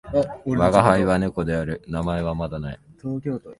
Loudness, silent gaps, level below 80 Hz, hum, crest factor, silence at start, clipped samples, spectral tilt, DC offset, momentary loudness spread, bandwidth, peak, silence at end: -22 LUFS; none; -40 dBFS; none; 22 dB; 0.05 s; under 0.1%; -7.5 dB/octave; under 0.1%; 14 LU; 11.5 kHz; 0 dBFS; 0.05 s